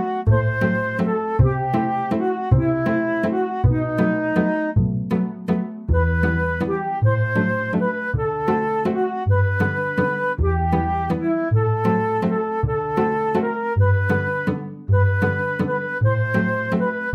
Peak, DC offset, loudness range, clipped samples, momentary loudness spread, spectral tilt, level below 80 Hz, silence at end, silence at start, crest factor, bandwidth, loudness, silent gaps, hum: -4 dBFS; under 0.1%; 1 LU; under 0.1%; 4 LU; -9.5 dB/octave; -34 dBFS; 0 s; 0 s; 16 dB; 5.6 kHz; -21 LUFS; none; none